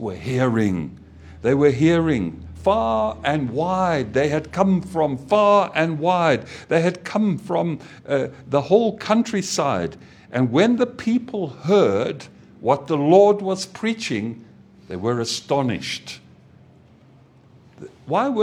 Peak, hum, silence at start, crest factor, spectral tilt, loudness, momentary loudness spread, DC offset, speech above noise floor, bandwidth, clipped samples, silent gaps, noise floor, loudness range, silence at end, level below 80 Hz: -2 dBFS; none; 0 s; 18 dB; -6 dB/octave; -21 LUFS; 11 LU; under 0.1%; 31 dB; 13.5 kHz; under 0.1%; none; -51 dBFS; 7 LU; 0 s; -50 dBFS